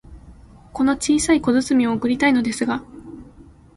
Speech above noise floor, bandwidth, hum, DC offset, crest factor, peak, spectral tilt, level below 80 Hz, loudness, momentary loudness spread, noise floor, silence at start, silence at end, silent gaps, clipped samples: 27 dB; 11.5 kHz; none; under 0.1%; 16 dB; -4 dBFS; -4 dB/octave; -46 dBFS; -19 LUFS; 20 LU; -46 dBFS; 0.05 s; 0.35 s; none; under 0.1%